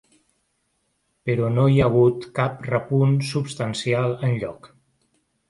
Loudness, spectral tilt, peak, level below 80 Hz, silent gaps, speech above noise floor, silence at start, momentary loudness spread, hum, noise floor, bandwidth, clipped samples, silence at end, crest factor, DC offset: -22 LUFS; -7 dB/octave; -6 dBFS; -52 dBFS; none; 50 dB; 1.25 s; 9 LU; none; -71 dBFS; 11.5 kHz; under 0.1%; 0.85 s; 16 dB; under 0.1%